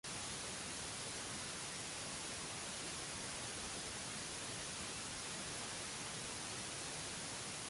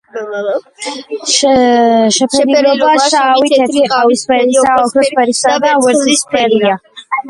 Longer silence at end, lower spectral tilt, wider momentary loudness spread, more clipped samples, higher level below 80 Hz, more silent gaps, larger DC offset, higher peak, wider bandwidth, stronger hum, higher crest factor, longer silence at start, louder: about the same, 0 s vs 0 s; about the same, -1.5 dB/octave vs -2.5 dB/octave; second, 0 LU vs 11 LU; neither; second, -66 dBFS vs -52 dBFS; neither; neither; second, -32 dBFS vs 0 dBFS; about the same, 11.5 kHz vs 11.5 kHz; neither; about the same, 14 dB vs 10 dB; about the same, 0.05 s vs 0.15 s; second, -44 LUFS vs -10 LUFS